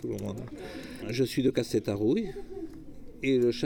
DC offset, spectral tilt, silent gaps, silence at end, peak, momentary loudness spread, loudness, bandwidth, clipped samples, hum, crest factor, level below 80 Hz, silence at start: under 0.1%; -6 dB/octave; none; 0 s; -14 dBFS; 15 LU; -30 LUFS; 18.5 kHz; under 0.1%; none; 16 dB; -52 dBFS; 0 s